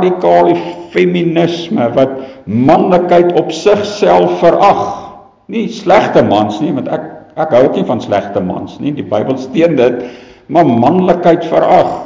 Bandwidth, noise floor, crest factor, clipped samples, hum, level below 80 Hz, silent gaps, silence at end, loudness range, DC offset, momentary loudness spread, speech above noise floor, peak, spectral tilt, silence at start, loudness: 7.6 kHz; -32 dBFS; 10 dB; 0.1%; none; -46 dBFS; none; 0 s; 3 LU; under 0.1%; 11 LU; 22 dB; 0 dBFS; -7 dB/octave; 0 s; -11 LUFS